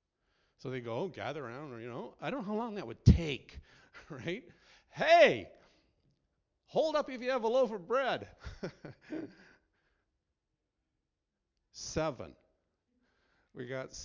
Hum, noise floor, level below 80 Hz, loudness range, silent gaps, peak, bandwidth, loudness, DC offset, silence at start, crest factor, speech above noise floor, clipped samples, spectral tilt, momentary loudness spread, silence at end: none; -86 dBFS; -46 dBFS; 14 LU; none; -8 dBFS; 7.6 kHz; -32 LUFS; under 0.1%; 0.65 s; 26 dB; 54 dB; under 0.1%; -6 dB/octave; 21 LU; 0 s